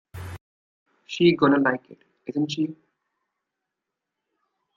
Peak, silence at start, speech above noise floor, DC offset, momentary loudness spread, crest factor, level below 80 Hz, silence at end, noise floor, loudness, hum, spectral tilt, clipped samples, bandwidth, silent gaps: -6 dBFS; 0.15 s; 62 dB; under 0.1%; 20 LU; 20 dB; -64 dBFS; 2.05 s; -84 dBFS; -23 LUFS; none; -6.5 dB/octave; under 0.1%; 7.4 kHz; 0.41-0.86 s